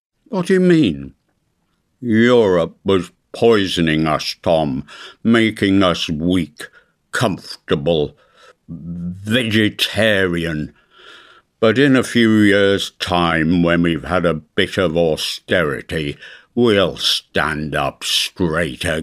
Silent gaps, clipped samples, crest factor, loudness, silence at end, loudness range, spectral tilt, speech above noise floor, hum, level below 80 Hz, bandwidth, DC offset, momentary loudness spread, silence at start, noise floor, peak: none; under 0.1%; 16 dB; -17 LUFS; 0 s; 4 LU; -5 dB/octave; 50 dB; none; -44 dBFS; 15.5 kHz; under 0.1%; 14 LU; 0.3 s; -66 dBFS; 0 dBFS